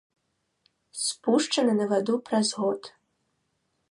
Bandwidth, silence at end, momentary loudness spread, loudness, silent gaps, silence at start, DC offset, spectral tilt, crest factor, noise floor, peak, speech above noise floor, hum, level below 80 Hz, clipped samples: 11.5 kHz; 1 s; 6 LU; -26 LUFS; none; 0.95 s; under 0.1%; -3.5 dB/octave; 18 dB; -76 dBFS; -10 dBFS; 51 dB; none; -80 dBFS; under 0.1%